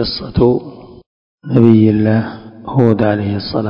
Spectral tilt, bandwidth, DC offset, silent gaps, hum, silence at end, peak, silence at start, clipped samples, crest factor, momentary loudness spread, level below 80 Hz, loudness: -10 dB/octave; 5.4 kHz; under 0.1%; 1.06-1.38 s; none; 0 s; 0 dBFS; 0 s; 0.6%; 14 dB; 13 LU; -36 dBFS; -13 LUFS